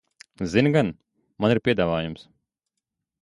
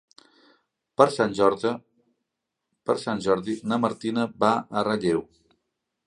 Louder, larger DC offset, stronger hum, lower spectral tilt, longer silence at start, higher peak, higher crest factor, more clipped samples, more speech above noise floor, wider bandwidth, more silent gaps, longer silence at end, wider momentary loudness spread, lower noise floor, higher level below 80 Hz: about the same, -23 LUFS vs -25 LUFS; neither; neither; first, -7 dB/octave vs -5.5 dB/octave; second, 0.4 s vs 1 s; second, -6 dBFS vs -2 dBFS; about the same, 20 dB vs 24 dB; neither; about the same, 61 dB vs 59 dB; about the same, 11 kHz vs 11 kHz; neither; first, 1 s vs 0.85 s; first, 13 LU vs 8 LU; about the same, -84 dBFS vs -83 dBFS; first, -52 dBFS vs -64 dBFS